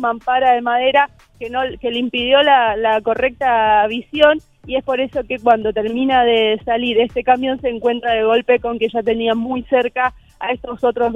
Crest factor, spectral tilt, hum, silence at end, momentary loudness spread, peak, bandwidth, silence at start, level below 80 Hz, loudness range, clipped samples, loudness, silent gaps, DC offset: 16 dB; -5.5 dB/octave; none; 0 s; 8 LU; 0 dBFS; 7.6 kHz; 0 s; -46 dBFS; 2 LU; under 0.1%; -16 LUFS; none; under 0.1%